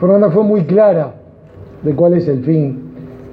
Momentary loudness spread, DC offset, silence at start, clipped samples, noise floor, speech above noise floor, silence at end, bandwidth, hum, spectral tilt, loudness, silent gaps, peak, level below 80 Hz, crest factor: 16 LU; under 0.1%; 0 s; under 0.1%; -37 dBFS; 25 dB; 0.05 s; 5 kHz; none; -12 dB/octave; -13 LUFS; none; 0 dBFS; -50 dBFS; 12 dB